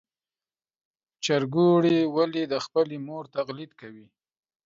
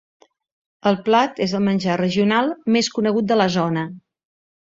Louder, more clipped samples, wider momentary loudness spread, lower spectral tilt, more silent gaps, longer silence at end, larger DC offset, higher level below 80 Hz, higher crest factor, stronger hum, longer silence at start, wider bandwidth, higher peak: second, -25 LUFS vs -19 LUFS; neither; first, 15 LU vs 5 LU; about the same, -6 dB/octave vs -5.5 dB/octave; neither; about the same, 0.7 s vs 0.7 s; neither; second, -74 dBFS vs -60 dBFS; about the same, 16 dB vs 18 dB; neither; first, 1.2 s vs 0.85 s; about the same, 7.8 kHz vs 7.8 kHz; second, -10 dBFS vs -2 dBFS